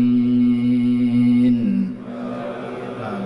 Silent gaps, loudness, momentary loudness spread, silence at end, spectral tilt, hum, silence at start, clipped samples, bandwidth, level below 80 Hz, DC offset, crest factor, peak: none; -19 LUFS; 13 LU; 0 s; -9 dB/octave; none; 0 s; under 0.1%; 5.2 kHz; -52 dBFS; under 0.1%; 10 dB; -10 dBFS